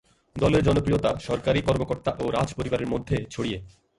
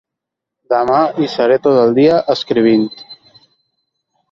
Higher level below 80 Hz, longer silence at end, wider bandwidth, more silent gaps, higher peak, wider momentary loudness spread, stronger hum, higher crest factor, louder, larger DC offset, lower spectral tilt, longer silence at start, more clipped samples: first, -42 dBFS vs -58 dBFS; second, 0.3 s vs 1.15 s; first, 11.5 kHz vs 7.4 kHz; neither; second, -8 dBFS vs 0 dBFS; about the same, 9 LU vs 7 LU; neither; about the same, 18 dB vs 14 dB; second, -25 LUFS vs -13 LUFS; neither; about the same, -6.5 dB/octave vs -7 dB/octave; second, 0.35 s vs 0.7 s; neither